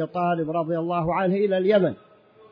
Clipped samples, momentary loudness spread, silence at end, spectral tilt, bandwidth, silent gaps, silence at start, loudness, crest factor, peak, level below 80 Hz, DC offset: under 0.1%; 6 LU; 0.55 s; -10 dB/octave; 5.2 kHz; none; 0 s; -23 LUFS; 16 dB; -8 dBFS; -58 dBFS; under 0.1%